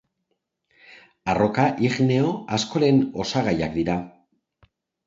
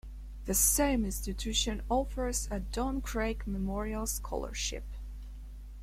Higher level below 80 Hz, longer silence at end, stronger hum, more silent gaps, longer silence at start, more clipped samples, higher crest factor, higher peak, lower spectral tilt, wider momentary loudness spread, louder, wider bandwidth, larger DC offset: second, -52 dBFS vs -38 dBFS; first, 0.95 s vs 0 s; second, none vs 50 Hz at -40 dBFS; neither; first, 1.25 s vs 0.05 s; neither; about the same, 18 dB vs 20 dB; first, -6 dBFS vs -14 dBFS; first, -6 dB/octave vs -3 dB/octave; second, 7 LU vs 20 LU; first, -22 LUFS vs -32 LUFS; second, 7.8 kHz vs 16.5 kHz; neither